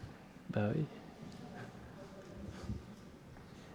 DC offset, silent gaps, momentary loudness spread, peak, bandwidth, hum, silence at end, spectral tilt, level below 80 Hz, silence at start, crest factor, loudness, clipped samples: under 0.1%; none; 18 LU; -22 dBFS; 15.5 kHz; none; 0 s; -7.5 dB/octave; -60 dBFS; 0 s; 22 dB; -44 LUFS; under 0.1%